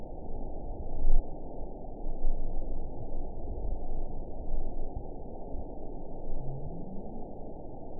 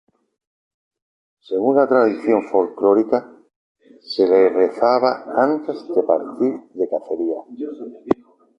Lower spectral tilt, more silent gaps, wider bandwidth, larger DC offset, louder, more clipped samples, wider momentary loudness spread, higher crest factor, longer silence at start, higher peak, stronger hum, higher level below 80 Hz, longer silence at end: first, -15 dB/octave vs -7.5 dB/octave; second, none vs 3.56-3.75 s; second, 1 kHz vs 6 kHz; first, 0.6% vs under 0.1%; second, -41 LUFS vs -19 LUFS; neither; second, 7 LU vs 11 LU; about the same, 18 dB vs 18 dB; second, 0 s vs 1.5 s; second, -10 dBFS vs -2 dBFS; neither; first, -32 dBFS vs -64 dBFS; second, 0 s vs 0.45 s